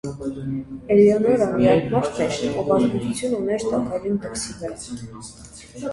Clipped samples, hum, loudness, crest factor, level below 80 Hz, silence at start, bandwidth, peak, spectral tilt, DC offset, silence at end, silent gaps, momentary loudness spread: under 0.1%; none; -21 LUFS; 18 dB; -48 dBFS; 0.05 s; 11.5 kHz; -4 dBFS; -6 dB/octave; under 0.1%; 0 s; none; 18 LU